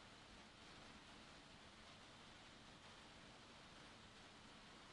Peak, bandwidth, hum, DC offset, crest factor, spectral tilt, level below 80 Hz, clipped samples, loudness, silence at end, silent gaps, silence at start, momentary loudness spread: -50 dBFS; 11 kHz; none; under 0.1%; 14 dB; -3 dB/octave; -76 dBFS; under 0.1%; -61 LUFS; 0 s; none; 0 s; 1 LU